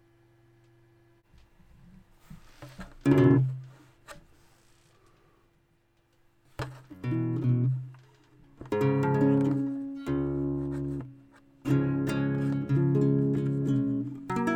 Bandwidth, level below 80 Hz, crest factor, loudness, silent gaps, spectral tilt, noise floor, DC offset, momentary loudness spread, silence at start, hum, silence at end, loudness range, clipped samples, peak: 9.4 kHz; -54 dBFS; 20 dB; -28 LUFS; none; -9 dB/octave; -68 dBFS; under 0.1%; 22 LU; 2.3 s; none; 0 s; 8 LU; under 0.1%; -10 dBFS